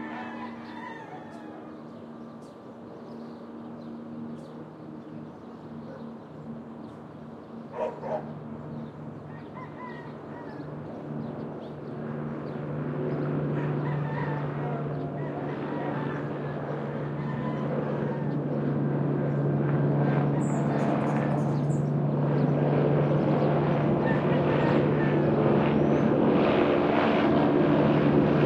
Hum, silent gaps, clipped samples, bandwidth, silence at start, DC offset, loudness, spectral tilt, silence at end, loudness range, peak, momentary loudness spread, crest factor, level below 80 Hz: none; none; under 0.1%; 8.4 kHz; 0 s; under 0.1%; -27 LUFS; -9 dB/octave; 0 s; 18 LU; -8 dBFS; 19 LU; 18 dB; -58 dBFS